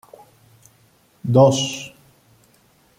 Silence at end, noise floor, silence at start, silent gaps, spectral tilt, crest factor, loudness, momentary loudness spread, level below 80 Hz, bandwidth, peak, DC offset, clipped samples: 1.1 s; -57 dBFS; 1.25 s; none; -5.5 dB/octave; 20 dB; -17 LUFS; 19 LU; -62 dBFS; 15.5 kHz; -2 dBFS; under 0.1%; under 0.1%